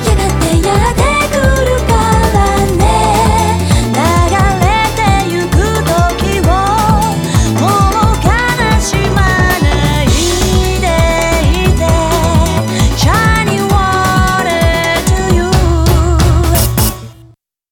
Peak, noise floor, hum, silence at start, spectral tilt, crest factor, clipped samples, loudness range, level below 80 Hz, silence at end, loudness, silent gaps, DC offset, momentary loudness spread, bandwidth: 0 dBFS; -43 dBFS; none; 0 s; -5 dB/octave; 10 dB; under 0.1%; 1 LU; -16 dBFS; 0.6 s; -11 LUFS; none; under 0.1%; 2 LU; 19.5 kHz